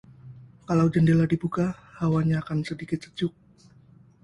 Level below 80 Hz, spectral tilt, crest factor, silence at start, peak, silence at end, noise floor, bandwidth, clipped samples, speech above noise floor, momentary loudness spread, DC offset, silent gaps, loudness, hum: -54 dBFS; -8 dB/octave; 16 dB; 0.25 s; -10 dBFS; 0.95 s; -55 dBFS; 10.5 kHz; under 0.1%; 31 dB; 11 LU; under 0.1%; none; -25 LUFS; none